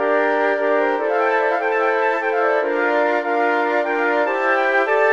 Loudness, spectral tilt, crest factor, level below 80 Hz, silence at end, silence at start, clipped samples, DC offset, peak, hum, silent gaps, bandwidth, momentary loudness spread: -18 LUFS; -3 dB/octave; 12 dB; -74 dBFS; 0 s; 0 s; under 0.1%; 0.2%; -6 dBFS; none; none; 7.4 kHz; 2 LU